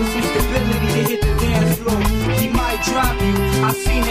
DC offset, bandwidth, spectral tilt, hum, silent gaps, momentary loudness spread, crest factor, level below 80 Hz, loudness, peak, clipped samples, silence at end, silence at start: under 0.1%; 15.5 kHz; -5 dB/octave; none; none; 2 LU; 14 dB; -24 dBFS; -18 LUFS; -2 dBFS; under 0.1%; 0 s; 0 s